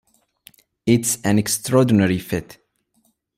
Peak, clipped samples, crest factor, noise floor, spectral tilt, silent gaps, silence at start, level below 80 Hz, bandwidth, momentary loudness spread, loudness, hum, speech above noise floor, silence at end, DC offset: -2 dBFS; under 0.1%; 18 dB; -65 dBFS; -5 dB/octave; none; 0.85 s; -54 dBFS; 16 kHz; 11 LU; -19 LUFS; none; 47 dB; 0.85 s; under 0.1%